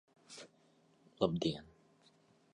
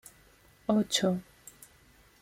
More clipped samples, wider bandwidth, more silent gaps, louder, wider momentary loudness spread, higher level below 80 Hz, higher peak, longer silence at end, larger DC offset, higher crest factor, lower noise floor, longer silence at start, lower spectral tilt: neither; second, 11 kHz vs 16.5 kHz; neither; second, -37 LUFS vs -30 LUFS; second, 20 LU vs 24 LU; about the same, -68 dBFS vs -66 dBFS; second, -18 dBFS vs -14 dBFS; about the same, 0.9 s vs 1 s; neither; about the same, 24 dB vs 20 dB; first, -70 dBFS vs -61 dBFS; second, 0.3 s vs 0.7 s; first, -6 dB/octave vs -4.5 dB/octave